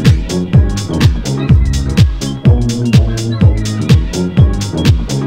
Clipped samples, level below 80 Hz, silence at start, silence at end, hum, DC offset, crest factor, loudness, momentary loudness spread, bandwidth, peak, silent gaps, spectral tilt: 1%; -18 dBFS; 0 s; 0 s; none; under 0.1%; 10 dB; -12 LUFS; 3 LU; 16 kHz; 0 dBFS; none; -6.5 dB/octave